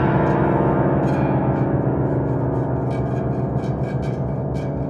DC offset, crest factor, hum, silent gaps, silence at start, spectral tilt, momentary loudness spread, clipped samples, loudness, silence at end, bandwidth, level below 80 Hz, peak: under 0.1%; 14 dB; none; none; 0 s; -10 dB/octave; 6 LU; under 0.1%; -21 LUFS; 0 s; 7 kHz; -36 dBFS; -6 dBFS